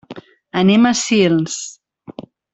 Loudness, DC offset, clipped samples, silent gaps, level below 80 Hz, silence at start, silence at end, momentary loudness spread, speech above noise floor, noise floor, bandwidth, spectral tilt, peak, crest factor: -15 LUFS; under 0.1%; under 0.1%; none; -58 dBFS; 0.1 s; 0.3 s; 24 LU; 24 dB; -38 dBFS; 8.4 kHz; -4.5 dB/octave; -2 dBFS; 16 dB